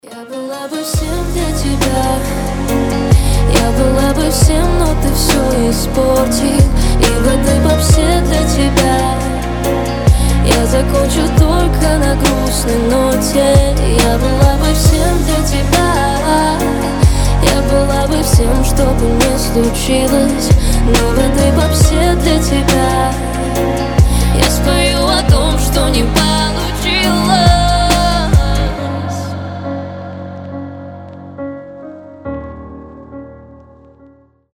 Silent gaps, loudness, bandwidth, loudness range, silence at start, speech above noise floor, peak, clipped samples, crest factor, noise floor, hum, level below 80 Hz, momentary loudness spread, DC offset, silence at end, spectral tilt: none; -12 LUFS; 19.5 kHz; 9 LU; 0.05 s; 34 dB; 0 dBFS; under 0.1%; 12 dB; -45 dBFS; none; -16 dBFS; 14 LU; under 0.1%; 1.15 s; -5 dB/octave